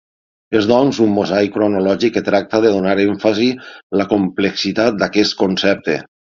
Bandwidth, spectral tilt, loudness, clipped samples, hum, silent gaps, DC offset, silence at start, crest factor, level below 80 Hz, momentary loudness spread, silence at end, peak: 7.4 kHz; -5.5 dB/octave; -16 LUFS; under 0.1%; none; 3.83-3.90 s; under 0.1%; 0.5 s; 16 dB; -52 dBFS; 5 LU; 0.15 s; 0 dBFS